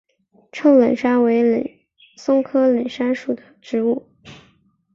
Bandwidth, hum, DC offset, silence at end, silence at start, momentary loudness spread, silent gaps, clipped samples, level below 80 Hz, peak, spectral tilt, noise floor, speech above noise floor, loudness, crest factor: 7.4 kHz; none; under 0.1%; 0.6 s; 0.55 s; 14 LU; none; under 0.1%; -64 dBFS; -4 dBFS; -6.5 dB/octave; -58 dBFS; 41 dB; -18 LUFS; 16 dB